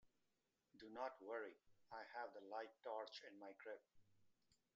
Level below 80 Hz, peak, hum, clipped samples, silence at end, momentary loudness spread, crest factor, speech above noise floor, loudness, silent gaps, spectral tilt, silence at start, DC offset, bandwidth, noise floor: under -90 dBFS; -34 dBFS; none; under 0.1%; 0.2 s; 8 LU; 22 dB; 35 dB; -55 LUFS; none; -0.5 dB/octave; 0.05 s; under 0.1%; 7.4 kHz; -89 dBFS